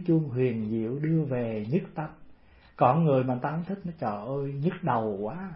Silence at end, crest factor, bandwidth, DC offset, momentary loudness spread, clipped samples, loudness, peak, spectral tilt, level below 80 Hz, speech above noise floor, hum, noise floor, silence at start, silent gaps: 0 s; 20 dB; 5.4 kHz; under 0.1%; 10 LU; under 0.1%; -28 LUFS; -8 dBFS; -12.5 dB/octave; -60 dBFS; 26 dB; none; -53 dBFS; 0 s; none